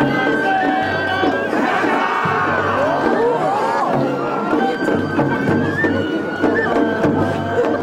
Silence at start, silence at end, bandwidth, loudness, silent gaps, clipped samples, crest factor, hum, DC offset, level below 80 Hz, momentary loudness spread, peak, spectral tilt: 0 s; 0 s; 15.5 kHz; -17 LUFS; none; under 0.1%; 12 dB; none; under 0.1%; -52 dBFS; 2 LU; -4 dBFS; -6.5 dB/octave